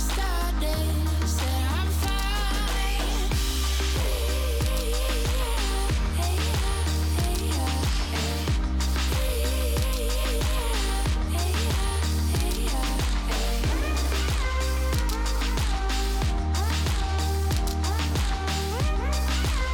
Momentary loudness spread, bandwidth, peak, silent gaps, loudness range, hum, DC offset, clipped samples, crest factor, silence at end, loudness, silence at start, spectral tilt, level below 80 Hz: 1 LU; 17.5 kHz; -12 dBFS; none; 0 LU; none; under 0.1%; under 0.1%; 12 dB; 0 s; -26 LUFS; 0 s; -4.5 dB/octave; -26 dBFS